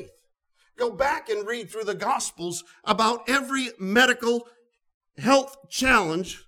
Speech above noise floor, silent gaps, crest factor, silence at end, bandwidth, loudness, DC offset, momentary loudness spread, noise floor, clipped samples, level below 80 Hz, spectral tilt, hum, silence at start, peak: 43 dB; 4.94-5.01 s; 20 dB; 0.1 s; 19.5 kHz; -24 LUFS; under 0.1%; 11 LU; -67 dBFS; under 0.1%; -52 dBFS; -3 dB/octave; none; 0 s; -4 dBFS